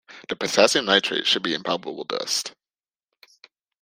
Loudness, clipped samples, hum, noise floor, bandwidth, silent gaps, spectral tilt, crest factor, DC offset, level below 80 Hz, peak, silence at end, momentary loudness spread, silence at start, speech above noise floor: -22 LUFS; under 0.1%; none; under -90 dBFS; 16 kHz; none; -2 dB/octave; 24 dB; under 0.1%; -68 dBFS; 0 dBFS; 1.3 s; 11 LU; 0.1 s; over 67 dB